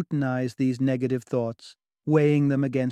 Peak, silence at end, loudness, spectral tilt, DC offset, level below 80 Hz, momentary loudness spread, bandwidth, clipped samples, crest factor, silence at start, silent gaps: -8 dBFS; 0 s; -25 LUFS; -8.5 dB/octave; under 0.1%; -66 dBFS; 10 LU; 10.5 kHz; under 0.1%; 16 dB; 0 s; none